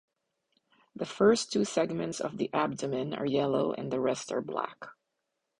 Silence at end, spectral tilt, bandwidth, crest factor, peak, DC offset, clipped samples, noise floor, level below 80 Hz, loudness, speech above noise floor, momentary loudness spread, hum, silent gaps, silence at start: 0.65 s; -5 dB/octave; 11 kHz; 20 dB; -12 dBFS; under 0.1%; under 0.1%; -83 dBFS; -70 dBFS; -30 LUFS; 53 dB; 14 LU; none; none; 1 s